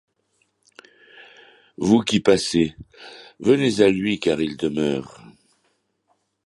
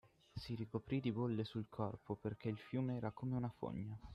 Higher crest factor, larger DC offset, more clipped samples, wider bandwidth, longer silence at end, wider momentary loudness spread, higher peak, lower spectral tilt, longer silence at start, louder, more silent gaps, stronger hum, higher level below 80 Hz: about the same, 20 dB vs 18 dB; neither; neither; first, 11.5 kHz vs 10 kHz; first, 1.4 s vs 0 s; first, 23 LU vs 6 LU; first, -2 dBFS vs -26 dBFS; second, -5 dB/octave vs -9 dB/octave; first, 1.8 s vs 0.05 s; first, -20 LUFS vs -44 LUFS; neither; neither; first, -54 dBFS vs -66 dBFS